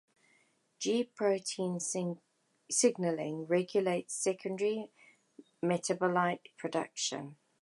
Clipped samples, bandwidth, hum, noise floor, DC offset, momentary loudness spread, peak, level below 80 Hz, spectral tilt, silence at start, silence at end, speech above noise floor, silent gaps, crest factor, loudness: under 0.1%; 11.5 kHz; none; -71 dBFS; under 0.1%; 10 LU; -14 dBFS; -86 dBFS; -4 dB/octave; 0.8 s; 0.3 s; 38 dB; none; 20 dB; -33 LUFS